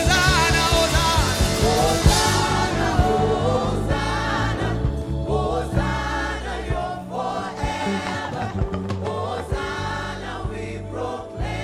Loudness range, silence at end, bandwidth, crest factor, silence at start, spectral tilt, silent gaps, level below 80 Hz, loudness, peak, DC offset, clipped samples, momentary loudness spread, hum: 8 LU; 0 s; 16 kHz; 18 dB; 0 s; -4.5 dB/octave; none; -30 dBFS; -22 LUFS; -4 dBFS; under 0.1%; under 0.1%; 12 LU; none